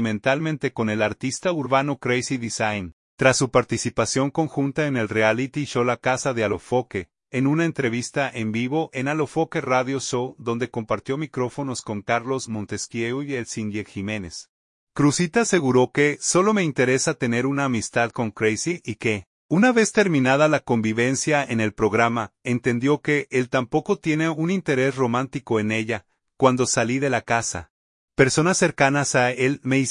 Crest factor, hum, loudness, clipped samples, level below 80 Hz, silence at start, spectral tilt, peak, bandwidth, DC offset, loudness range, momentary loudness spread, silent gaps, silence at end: 20 dB; none; -22 LUFS; under 0.1%; -56 dBFS; 0 s; -5 dB/octave; -2 dBFS; 11 kHz; under 0.1%; 5 LU; 9 LU; 2.93-3.18 s, 14.49-14.87 s, 19.27-19.49 s, 27.70-28.08 s; 0 s